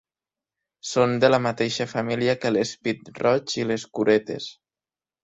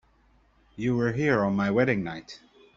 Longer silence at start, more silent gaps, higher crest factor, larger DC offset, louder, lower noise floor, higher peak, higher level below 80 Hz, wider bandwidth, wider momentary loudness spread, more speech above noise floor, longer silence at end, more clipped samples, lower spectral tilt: about the same, 0.85 s vs 0.8 s; neither; about the same, 20 dB vs 20 dB; neither; first, -23 LUFS vs -26 LUFS; first, under -90 dBFS vs -62 dBFS; first, -4 dBFS vs -8 dBFS; second, -64 dBFS vs -56 dBFS; about the same, 8.2 kHz vs 7.6 kHz; second, 10 LU vs 18 LU; first, over 67 dB vs 37 dB; first, 0.7 s vs 0.4 s; neither; second, -5 dB/octave vs -7.5 dB/octave